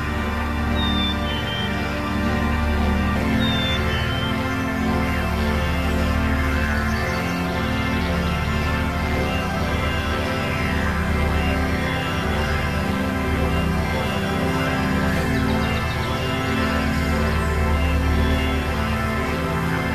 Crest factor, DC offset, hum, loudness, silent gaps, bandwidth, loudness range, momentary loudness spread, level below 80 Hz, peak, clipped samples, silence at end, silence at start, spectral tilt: 12 dB; 0.4%; none; -22 LUFS; none; 14 kHz; 1 LU; 2 LU; -26 dBFS; -8 dBFS; under 0.1%; 0 s; 0 s; -6 dB/octave